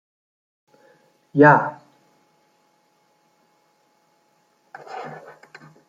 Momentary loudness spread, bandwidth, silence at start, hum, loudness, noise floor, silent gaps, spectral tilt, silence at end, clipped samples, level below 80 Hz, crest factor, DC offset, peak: 29 LU; 7.4 kHz; 1.35 s; none; -16 LUFS; -64 dBFS; none; -8.5 dB/octave; 0.75 s; under 0.1%; -74 dBFS; 24 dB; under 0.1%; -2 dBFS